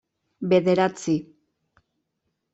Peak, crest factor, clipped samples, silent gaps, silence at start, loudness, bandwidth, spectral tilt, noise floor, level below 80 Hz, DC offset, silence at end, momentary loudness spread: -6 dBFS; 18 dB; under 0.1%; none; 0.4 s; -23 LUFS; 8.2 kHz; -6.5 dB/octave; -78 dBFS; -66 dBFS; under 0.1%; 1.3 s; 8 LU